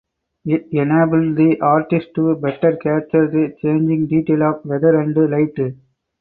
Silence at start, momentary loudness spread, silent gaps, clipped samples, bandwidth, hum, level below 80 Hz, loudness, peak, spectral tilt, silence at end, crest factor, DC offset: 0.45 s; 6 LU; none; under 0.1%; 4.1 kHz; none; -58 dBFS; -17 LUFS; -2 dBFS; -13 dB/octave; 0.45 s; 14 dB; under 0.1%